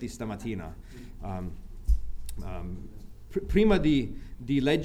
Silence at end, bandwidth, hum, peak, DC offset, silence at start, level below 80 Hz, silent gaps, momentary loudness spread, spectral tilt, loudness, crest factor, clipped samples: 0 s; 14 kHz; none; -10 dBFS; under 0.1%; 0 s; -36 dBFS; none; 20 LU; -7 dB/octave; -30 LUFS; 18 dB; under 0.1%